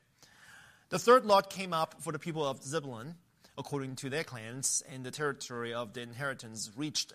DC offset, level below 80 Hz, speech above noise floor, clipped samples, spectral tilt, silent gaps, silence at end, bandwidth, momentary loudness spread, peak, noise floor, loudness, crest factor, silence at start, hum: under 0.1%; -76 dBFS; 27 dB; under 0.1%; -3.5 dB/octave; none; 0 s; 15.5 kHz; 17 LU; -12 dBFS; -60 dBFS; -33 LUFS; 22 dB; 0.2 s; none